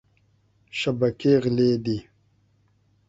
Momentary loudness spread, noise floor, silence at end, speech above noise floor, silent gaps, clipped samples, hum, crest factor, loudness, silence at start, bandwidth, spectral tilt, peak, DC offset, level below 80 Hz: 11 LU; -64 dBFS; 1.05 s; 42 dB; none; under 0.1%; none; 18 dB; -23 LUFS; 0.75 s; 8 kHz; -7 dB/octave; -8 dBFS; under 0.1%; -58 dBFS